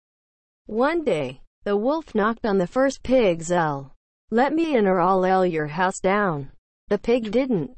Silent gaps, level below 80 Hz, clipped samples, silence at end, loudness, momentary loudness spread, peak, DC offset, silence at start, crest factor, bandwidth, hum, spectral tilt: 1.47-1.62 s, 3.96-4.28 s, 6.58-6.87 s; -50 dBFS; under 0.1%; 0 s; -22 LUFS; 8 LU; -8 dBFS; under 0.1%; 0.7 s; 16 dB; 8.8 kHz; none; -6 dB/octave